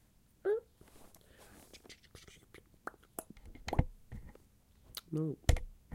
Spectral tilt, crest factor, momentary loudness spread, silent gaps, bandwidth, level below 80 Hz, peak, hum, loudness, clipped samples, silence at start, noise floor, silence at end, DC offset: -6 dB/octave; 28 dB; 25 LU; none; 16.5 kHz; -44 dBFS; -12 dBFS; none; -39 LUFS; under 0.1%; 0.45 s; -65 dBFS; 0 s; under 0.1%